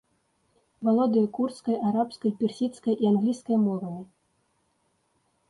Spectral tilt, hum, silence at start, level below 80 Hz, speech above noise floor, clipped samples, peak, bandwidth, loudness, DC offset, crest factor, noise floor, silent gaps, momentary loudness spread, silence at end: -8 dB/octave; none; 0.8 s; -72 dBFS; 46 dB; under 0.1%; -12 dBFS; 11 kHz; -26 LUFS; under 0.1%; 14 dB; -71 dBFS; none; 7 LU; 1.45 s